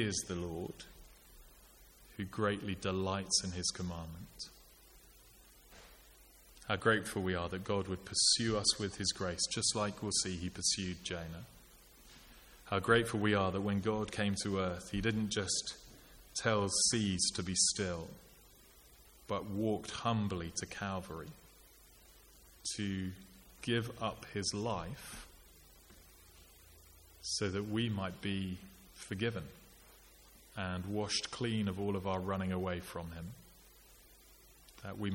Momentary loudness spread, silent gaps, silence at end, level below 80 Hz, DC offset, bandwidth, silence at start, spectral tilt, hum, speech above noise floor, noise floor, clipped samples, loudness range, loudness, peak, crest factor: 20 LU; none; 0 s; -60 dBFS; under 0.1%; 17 kHz; 0 s; -3.5 dB/octave; none; 25 dB; -61 dBFS; under 0.1%; 9 LU; -36 LUFS; -14 dBFS; 24 dB